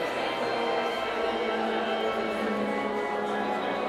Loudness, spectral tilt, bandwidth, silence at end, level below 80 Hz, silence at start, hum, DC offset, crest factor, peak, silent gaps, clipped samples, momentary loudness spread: -29 LUFS; -4.5 dB/octave; 15.5 kHz; 0 s; -62 dBFS; 0 s; none; under 0.1%; 12 dB; -16 dBFS; none; under 0.1%; 1 LU